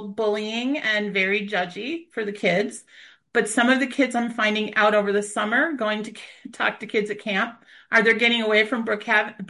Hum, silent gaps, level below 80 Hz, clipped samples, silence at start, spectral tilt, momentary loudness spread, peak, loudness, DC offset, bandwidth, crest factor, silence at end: none; none; -72 dBFS; under 0.1%; 0 s; -3.5 dB/octave; 11 LU; -4 dBFS; -22 LUFS; under 0.1%; 11.5 kHz; 20 dB; 0.05 s